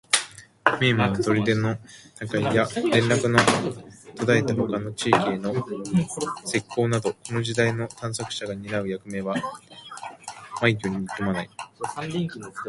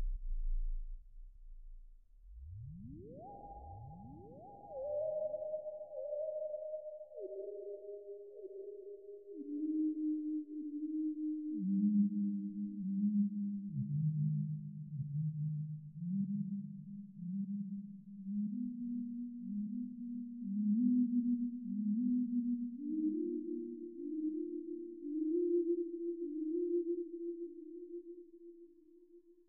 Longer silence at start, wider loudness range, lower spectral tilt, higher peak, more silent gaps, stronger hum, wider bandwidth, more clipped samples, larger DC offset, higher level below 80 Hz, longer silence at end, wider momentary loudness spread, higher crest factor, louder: about the same, 0.1 s vs 0 s; second, 7 LU vs 10 LU; second, -5 dB/octave vs -9.5 dB/octave; first, 0 dBFS vs -24 dBFS; neither; neither; first, 11.5 kHz vs 0.9 kHz; neither; neither; about the same, -56 dBFS vs -52 dBFS; second, 0 s vs 0.15 s; about the same, 17 LU vs 17 LU; first, 24 dB vs 16 dB; first, -24 LUFS vs -39 LUFS